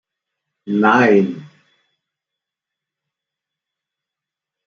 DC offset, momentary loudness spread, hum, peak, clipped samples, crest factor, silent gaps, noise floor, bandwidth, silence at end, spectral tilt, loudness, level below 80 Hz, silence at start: under 0.1%; 13 LU; none; -2 dBFS; under 0.1%; 20 dB; none; -86 dBFS; 7 kHz; 3.2 s; -7 dB/octave; -15 LUFS; -68 dBFS; 0.65 s